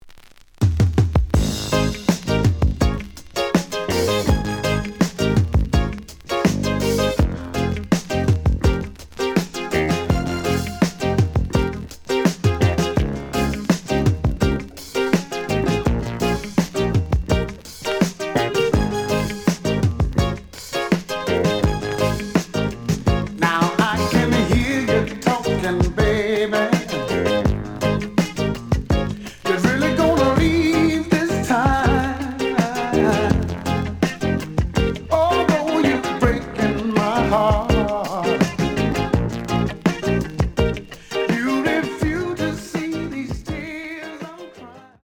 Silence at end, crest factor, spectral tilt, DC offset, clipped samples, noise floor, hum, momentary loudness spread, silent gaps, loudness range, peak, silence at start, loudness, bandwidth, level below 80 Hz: 0.2 s; 18 dB; -6 dB/octave; under 0.1%; under 0.1%; -45 dBFS; none; 7 LU; none; 3 LU; -2 dBFS; 0.05 s; -20 LUFS; over 20 kHz; -30 dBFS